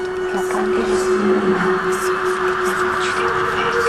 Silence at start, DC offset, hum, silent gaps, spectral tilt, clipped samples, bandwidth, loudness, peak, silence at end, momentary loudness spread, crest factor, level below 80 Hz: 0 s; under 0.1%; none; none; -4.5 dB/octave; under 0.1%; 14 kHz; -18 LUFS; -6 dBFS; 0 s; 3 LU; 12 dB; -46 dBFS